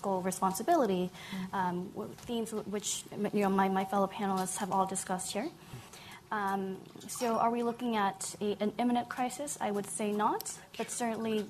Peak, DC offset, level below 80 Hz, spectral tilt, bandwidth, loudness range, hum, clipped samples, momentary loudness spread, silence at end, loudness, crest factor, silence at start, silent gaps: -16 dBFS; under 0.1%; -68 dBFS; -4.5 dB/octave; 14 kHz; 2 LU; none; under 0.1%; 11 LU; 0 s; -33 LUFS; 18 dB; 0 s; none